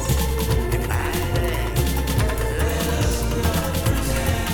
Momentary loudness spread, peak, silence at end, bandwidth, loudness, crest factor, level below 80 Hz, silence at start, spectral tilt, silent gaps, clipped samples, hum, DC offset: 1 LU; -6 dBFS; 0 s; over 20 kHz; -22 LUFS; 14 dB; -26 dBFS; 0 s; -5 dB/octave; none; under 0.1%; none; under 0.1%